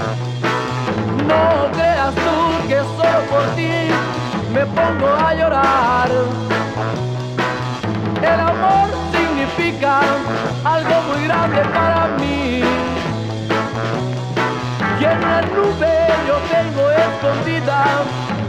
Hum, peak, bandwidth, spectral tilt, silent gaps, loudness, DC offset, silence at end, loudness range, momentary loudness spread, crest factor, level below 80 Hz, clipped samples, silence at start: none; -4 dBFS; 12.5 kHz; -6 dB/octave; none; -17 LUFS; under 0.1%; 0 s; 2 LU; 6 LU; 14 dB; -40 dBFS; under 0.1%; 0 s